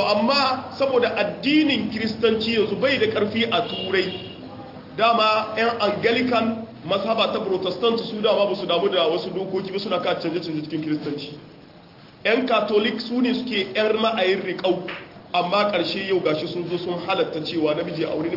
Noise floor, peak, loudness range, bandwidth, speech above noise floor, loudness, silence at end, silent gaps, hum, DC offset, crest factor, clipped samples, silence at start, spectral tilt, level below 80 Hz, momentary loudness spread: -47 dBFS; -6 dBFS; 3 LU; 5.8 kHz; 25 dB; -22 LUFS; 0 s; none; none; under 0.1%; 16 dB; under 0.1%; 0 s; -6 dB/octave; -62 dBFS; 8 LU